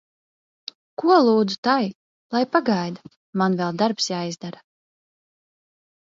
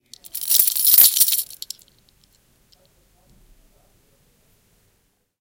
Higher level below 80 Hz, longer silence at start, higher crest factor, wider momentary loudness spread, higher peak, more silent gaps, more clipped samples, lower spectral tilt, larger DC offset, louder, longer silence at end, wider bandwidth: second, -70 dBFS vs -62 dBFS; first, 1 s vs 0.35 s; about the same, 20 dB vs 22 dB; second, 20 LU vs 24 LU; second, -4 dBFS vs 0 dBFS; first, 1.58-1.63 s, 1.95-2.30 s, 3.16-3.33 s vs none; neither; first, -5.5 dB/octave vs 3 dB/octave; neither; second, -21 LUFS vs -13 LUFS; second, 1.55 s vs 3.85 s; second, 7.6 kHz vs 18 kHz